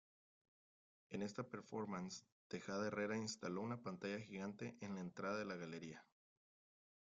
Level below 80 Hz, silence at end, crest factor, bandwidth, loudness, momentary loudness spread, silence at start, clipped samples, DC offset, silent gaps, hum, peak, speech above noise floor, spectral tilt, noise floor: -84 dBFS; 1 s; 18 dB; 9 kHz; -48 LUFS; 9 LU; 1.1 s; under 0.1%; under 0.1%; 2.32-2.50 s; none; -30 dBFS; over 42 dB; -5 dB/octave; under -90 dBFS